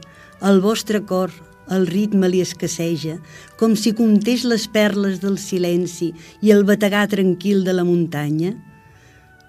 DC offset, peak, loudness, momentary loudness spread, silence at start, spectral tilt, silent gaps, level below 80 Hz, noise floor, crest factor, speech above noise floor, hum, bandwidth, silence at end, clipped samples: under 0.1%; 0 dBFS; -18 LUFS; 9 LU; 0 s; -5.5 dB/octave; none; -58 dBFS; -48 dBFS; 18 dB; 31 dB; none; 15.5 kHz; 0.8 s; under 0.1%